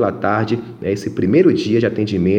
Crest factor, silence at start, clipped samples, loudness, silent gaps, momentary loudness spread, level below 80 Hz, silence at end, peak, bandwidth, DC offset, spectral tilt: 14 dB; 0 s; under 0.1%; -17 LUFS; none; 9 LU; -50 dBFS; 0 s; -2 dBFS; 9.2 kHz; under 0.1%; -7.5 dB/octave